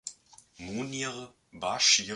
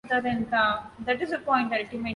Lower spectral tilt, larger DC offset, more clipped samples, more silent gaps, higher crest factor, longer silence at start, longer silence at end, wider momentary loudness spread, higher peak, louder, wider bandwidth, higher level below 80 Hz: second, -1 dB/octave vs -6 dB/octave; neither; neither; neither; about the same, 22 dB vs 18 dB; about the same, 0.05 s vs 0.05 s; about the same, 0 s vs 0 s; first, 22 LU vs 6 LU; about the same, -10 dBFS vs -8 dBFS; about the same, -28 LUFS vs -26 LUFS; about the same, 11.5 kHz vs 11 kHz; second, -66 dBFS vs -56 dBFS